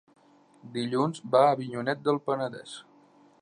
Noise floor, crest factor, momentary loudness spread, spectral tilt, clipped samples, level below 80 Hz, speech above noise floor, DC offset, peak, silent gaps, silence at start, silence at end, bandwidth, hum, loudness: -59 dBFS; 20 dB; 18 LU; -6 dB/octave; under 0.1%; -80 dBFS; 32 dB; under 0.1%; -10 dBFS; none; 0.65 s; 0.6 s; 11 kHz; none; -27 LUFS